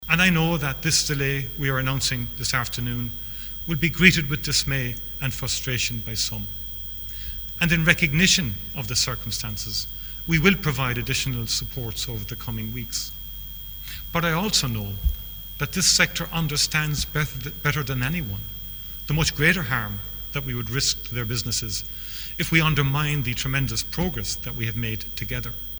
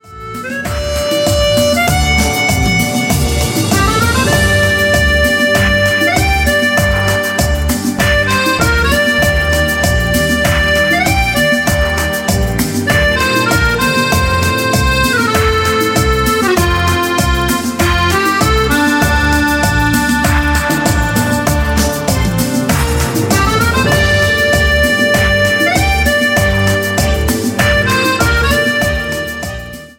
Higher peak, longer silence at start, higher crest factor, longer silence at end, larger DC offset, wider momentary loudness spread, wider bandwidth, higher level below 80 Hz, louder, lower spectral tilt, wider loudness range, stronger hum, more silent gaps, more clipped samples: about the same, 0 dBFS vs 0 dBFS; about the same, 0 s vs 0.05 s; first, 24 dB vs 12 dB; about the same, 0 s vs 0.05 s; neither; first, 13 LU vs 4 LU; first, over 20 kHz vs 17 kHz; second, -38 dBFS vs -20 dBFS; second, -23 LUFS vs -12 LUFS; about the same, -3.5 dB/octave vs -4 dB/octave; about the same, 4 LU vs 2 LU; neither; neither; neither